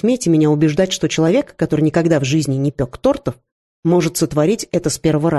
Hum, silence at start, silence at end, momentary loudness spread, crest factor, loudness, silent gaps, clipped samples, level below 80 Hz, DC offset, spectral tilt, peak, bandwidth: none; 0.05 s; 0 s; 5 LU; 14 dB; -17 LUFS; 3.52-3.83 s; under 0.1%; -44 dBFS; under 0.1%; -6 dB/octave; -2 dBFS; 12.5 kHz